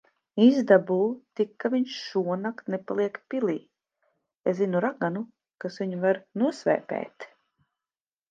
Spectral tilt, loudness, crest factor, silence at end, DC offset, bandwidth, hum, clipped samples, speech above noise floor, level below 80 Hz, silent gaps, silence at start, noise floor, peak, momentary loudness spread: -7 dB/octave; -26 LUFS; 22 dB; 1.05 s; under 0.1%; 7.6 kHz; none; under 0.1%; over 64 dB; -80 dBFS; 4.36-4.40 s; 0.35 s; under -90 dBFS; -6 dBFS; 15 LU